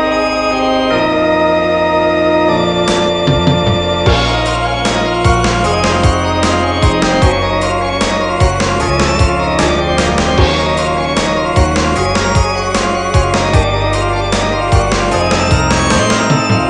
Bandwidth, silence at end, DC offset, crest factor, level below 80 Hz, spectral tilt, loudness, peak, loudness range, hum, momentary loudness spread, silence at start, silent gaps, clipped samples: 11 kHz; 0 s; under 0.1%; 12 dB; -22 dBFS; -5 dB/octave; -12 LUFS; 0 dBFS; 1 LU; none; 3 LU; 0 s; none; under 0.1%